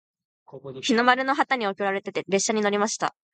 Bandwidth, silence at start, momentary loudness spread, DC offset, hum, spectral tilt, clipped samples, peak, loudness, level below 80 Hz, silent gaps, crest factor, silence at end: 9.4 kHz; 0.55 s; 10 LU; under 0.1%; none; -3 dB/octave; under 0.1%; -4 dBFS; -24 LUFS; -76 dBFS; none; 22 dB; 0.25 s